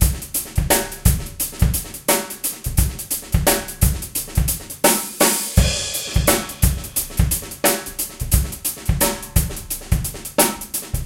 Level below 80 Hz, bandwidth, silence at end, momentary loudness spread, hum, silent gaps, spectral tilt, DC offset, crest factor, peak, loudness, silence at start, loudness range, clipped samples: -26 dBFS; 16.5 kHz; 0 s; 7 LU; none; none; -3.5 dB/octave; under 0.1%; 20 dB; 0 dBFS; -20 LUFS; 0 s; 2 LU; under 0.1%